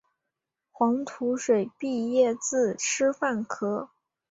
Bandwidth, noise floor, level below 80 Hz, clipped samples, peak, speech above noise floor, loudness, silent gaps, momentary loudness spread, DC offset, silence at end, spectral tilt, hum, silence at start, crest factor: 8 kHz; -85 dBFS; -72 dBFS; under 0.1%; -10 dBFS; 59 dB; -27 LUFS; none; 7 LU; under 0.1%; 0.45 s; -3.5 dB/octave; none; 0.8 s; 16 dB